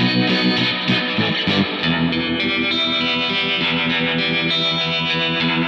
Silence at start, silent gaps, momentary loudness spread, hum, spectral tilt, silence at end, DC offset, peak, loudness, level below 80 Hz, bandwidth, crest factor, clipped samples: 0 s; none; 2 LU; none; -5.5 dB/octave; 0 s; under 0.1%; -6 dBFS; -17 LUFS; -50 dBFS; 7.8 kHz; 14 dB; under 0.1%